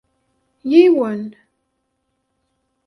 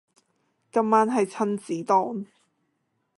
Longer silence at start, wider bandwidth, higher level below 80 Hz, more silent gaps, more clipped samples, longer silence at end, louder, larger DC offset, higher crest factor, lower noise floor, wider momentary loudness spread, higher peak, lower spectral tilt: about the same, 0.65 s vs 0.75 s; second, 6 kHz vs 11.5 kHz; first, -68 dBFS vs -78 dBFS; neither; neither; first, 1.55 s vs 0.95 s; first, -14 LUFS vs -24 LUFS; neither; about the same, 20 dB vs 18 dB; second, -71 dBFS vs -75 dBFS; first, 19 LU vs 12 LU; first, 0 dBFS vs -8 dBFS; about the same, -7 dB/octave vs -6 dB/octave